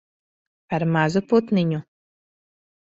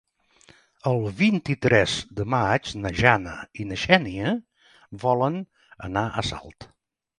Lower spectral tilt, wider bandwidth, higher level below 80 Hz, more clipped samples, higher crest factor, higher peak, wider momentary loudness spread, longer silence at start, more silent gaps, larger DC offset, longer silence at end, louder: first, -7.5 dB/octave vs -5.5 dB/octave; second, 7.8 kHz vs 11 kHz; second, -62 dBFS vs -48 dBFS; neither; about the same, 20 dB vs 24 dB; second, -4 dBFS vs 0 dBFS; second, 9 LU vs 14 LU; second, 0.7 s vs 0.85 s; neither; neither; first, 1.15 s vs 0.55 s; about the same, -22 LUFS vs -24 LUFS